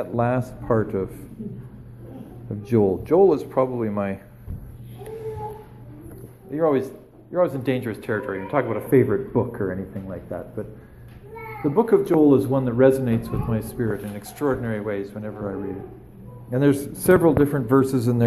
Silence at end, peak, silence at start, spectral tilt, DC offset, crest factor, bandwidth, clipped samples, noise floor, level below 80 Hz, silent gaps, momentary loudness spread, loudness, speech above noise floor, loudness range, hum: 0 s; -4 dBFS; 0 s; -8 dB/octave; under 0.1%; 18 dB; 13 kHz; under 0.1%; -41 dBFS; -46 dBFS; none; 22 LU; -22 LUFS; 20 dB; 7 LU; none